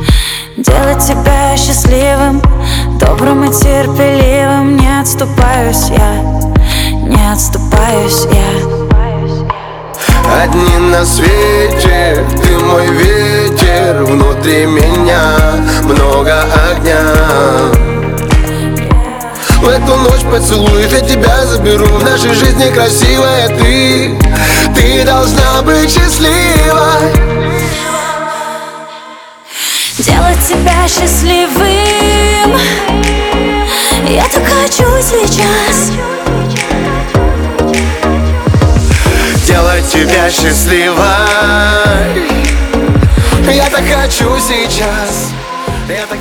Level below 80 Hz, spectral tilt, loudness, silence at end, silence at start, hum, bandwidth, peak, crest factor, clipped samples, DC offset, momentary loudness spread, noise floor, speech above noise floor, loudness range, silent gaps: -14 dBFS; -4.5 dB/octave; -9 LUFS; 0 s; 0 s; none; 19.5 kHz; 0 dBFS; 8 dB; 0.8%; under 0.1%; 6 LU; -30 dBFS; 23 dB; 3 LU; none